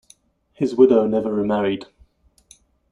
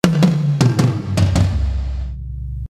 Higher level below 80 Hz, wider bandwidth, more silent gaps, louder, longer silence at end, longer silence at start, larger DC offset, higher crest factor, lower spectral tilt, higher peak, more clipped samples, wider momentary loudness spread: second, -56 dBFS vs -24 dBFS; second, 11 kHz vs 15 kHz; neither; about the same, -19 LUFS vs -17 LUFS; first, 1.05 s vs 0 s; first, 0.6 s vs 0.05 s; neither; about the same, 18 dB vs 16 dB; about the same, -7.5 dB/octave vs -7 dB/octave; about the same, -2 dBFS vs 0 dBFS; neither; about the same, 11 LU vs 13 LU